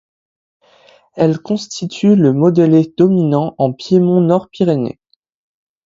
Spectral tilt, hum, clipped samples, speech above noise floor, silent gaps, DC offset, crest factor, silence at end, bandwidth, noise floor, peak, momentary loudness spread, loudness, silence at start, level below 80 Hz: -8 dB/octave; none; under 0.1%; 36 dB; none; under 0.1%; 14 dB; 0.95 s; 7.8 kHz; -49 dBFS; 0 dBFS; 9 LU; -14 LUFS; 1.15 s; -56 dBFS